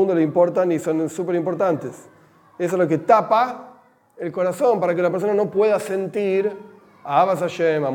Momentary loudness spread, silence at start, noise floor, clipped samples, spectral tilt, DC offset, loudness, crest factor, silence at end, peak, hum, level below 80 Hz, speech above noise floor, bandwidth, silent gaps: 10 LU; 0 s; -50 dBFS; under 0.1%; -6.5 dB/octave; under 0.1%; -20 LUFS; 18 dB; 0 s; -2 dBFS; none; -74 dBFS; 31 dB; 17.5 kHz; none